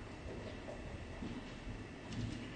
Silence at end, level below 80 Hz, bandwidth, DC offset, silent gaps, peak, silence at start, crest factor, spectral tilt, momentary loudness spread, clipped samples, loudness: 0 s; -54 dBFS; 9.4 kHz; under 0.1%; none; -30 dBFS; 0 s; 16 dB; -6 dB/octave; 4 LU; under 0.1%; -47 LUFS